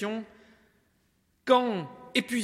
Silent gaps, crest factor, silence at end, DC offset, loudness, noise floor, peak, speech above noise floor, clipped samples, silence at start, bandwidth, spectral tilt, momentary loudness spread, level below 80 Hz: none; 22 dB; 0 s; under 0.1%; -28 LUFS; -70 dBFS; -8 dBFS; 43 dB; under 0.1%; 0 s; 15 kHz; -4.5 dB/octave; 16 LU; -74 dBFS